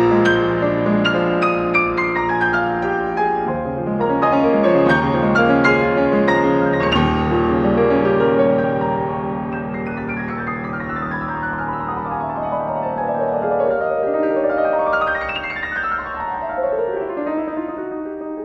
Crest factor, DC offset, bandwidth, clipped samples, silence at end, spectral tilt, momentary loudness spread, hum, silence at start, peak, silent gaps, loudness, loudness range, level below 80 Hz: 16 dB; under 0.1%; 7.8 kHz; under 0.1%; 0 s; -7.5 dB/octave; 9 LU; none; 0 s; -2 dBFS; none; -18 LUFS; 8 LU; -40 dBFS